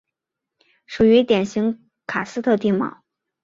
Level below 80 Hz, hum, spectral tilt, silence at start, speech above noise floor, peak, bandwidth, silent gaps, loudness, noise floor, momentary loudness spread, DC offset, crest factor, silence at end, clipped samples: -54 dBFS; none; -6.5 dB/octave; 0.9 s; 65 dB; -4 dBFS; 7.6 kHz; none; -20 LUFS; -83 dBFS; 13 LU; under 0.1%; 16 dB; 0.55 s; under 0.1%